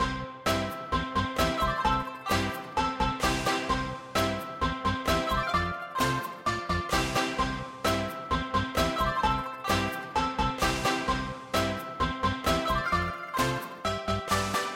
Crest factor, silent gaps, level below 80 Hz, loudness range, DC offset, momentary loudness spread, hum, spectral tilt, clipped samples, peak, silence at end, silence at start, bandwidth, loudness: 18 dB; none; -42 dBFS; 1 LU; under 0.1%; 5 LU; none; -4 dB/octave; under 0.1%; -12 dBFS; 0 s; 0 s; 16.5 kHz; -29 LUFS